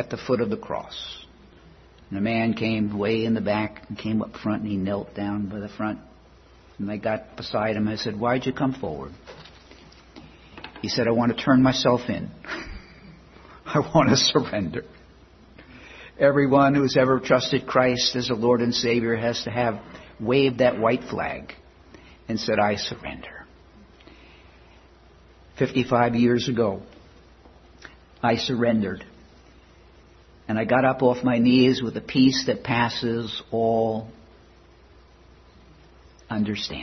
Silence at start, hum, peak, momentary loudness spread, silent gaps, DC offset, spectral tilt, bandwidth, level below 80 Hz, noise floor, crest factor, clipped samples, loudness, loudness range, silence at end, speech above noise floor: 0 s; none; -4 dBFS; 17 LU; none; under 0.1%; -5.5 dB/octave; 6.4 kHz; -52 dBFS; -52 dBFS; 22 dB; under 0.1%; -23 LUFS; 8 LU; 0 s; 29 dB